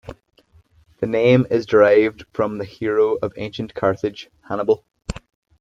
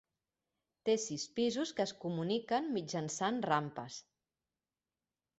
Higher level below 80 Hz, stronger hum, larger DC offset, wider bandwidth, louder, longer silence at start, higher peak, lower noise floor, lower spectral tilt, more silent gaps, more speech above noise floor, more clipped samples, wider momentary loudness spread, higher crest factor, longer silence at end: first, -48 dBFS vs -78 dBFS; neither; neither; about the same, 7.8 kHz vs 8.2 kHz; first, -19 LUFS vs -36 LUFS; second, 0.05 s vs 0.85 s; first, -2 dBFS vs -16 dBFS; second, -55 dBFS vs under -90 dBFS; first, -7.5 dB/octave vs -4.5 dB/octave; neither; second, 36 dB vs over 54 dB; neither; first, 17 LU vs 8 LU; about the same, 18 dB vs 22 dB; second, 0.4 s vs 1.4 s